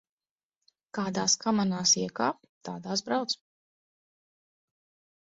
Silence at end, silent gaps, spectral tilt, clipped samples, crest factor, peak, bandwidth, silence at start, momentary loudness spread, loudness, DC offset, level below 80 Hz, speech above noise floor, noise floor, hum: 1.85 s; 2.49-2.61 s; -3 dB/octave; under 0.1%; 20 dB; -12 dBFS; 8 kHz; 0.95 s; 16 LU; -28 LUFS; under 0.1%; -72 dBFS; over 61 dB; under -90 dBFS; none